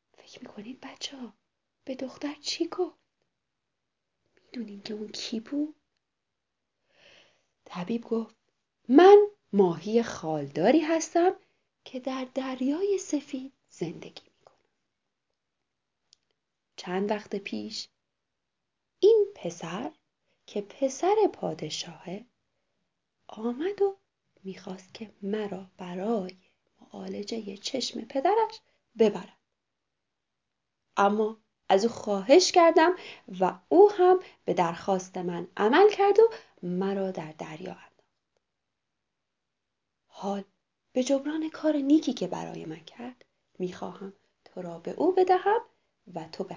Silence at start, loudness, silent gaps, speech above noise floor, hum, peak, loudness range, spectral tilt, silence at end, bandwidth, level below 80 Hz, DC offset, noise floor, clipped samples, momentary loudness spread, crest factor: 0.35 s; -26 LUFS; none; 59 dB; none; -6 dBFS; 16 LU; -5 dB/octave; 0 s; 7.6 kHz; -76 dBFS; under 0.1%; -85 dBFS; under 0.1%; 22 LU; 24 dB